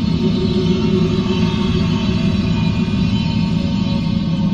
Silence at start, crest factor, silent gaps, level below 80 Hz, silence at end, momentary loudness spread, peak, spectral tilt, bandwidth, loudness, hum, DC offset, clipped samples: 0 s; 12 dB; none; -30 dBFS; 0 s; 2 LU; -4 dBFS; -7.5 dB/octave; 7.6 kHz; -17 LUFS; none; under 0.1%; under 0.1%